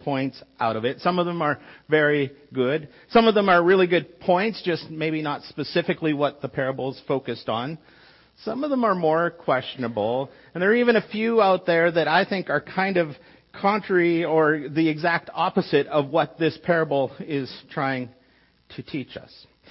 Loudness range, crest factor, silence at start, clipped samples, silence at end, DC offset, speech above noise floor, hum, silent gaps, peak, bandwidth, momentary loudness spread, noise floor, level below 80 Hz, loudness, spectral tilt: 6 LU; 18 dB; 0.05 s; under 0.1%; 0.5 s; under 0.1%; 37 dB; none; none; -6 dBFS; 5.8 kHz; 12 LU; -60 dBFS; -62 dBFS; -23 LUFS; -10 dB/octave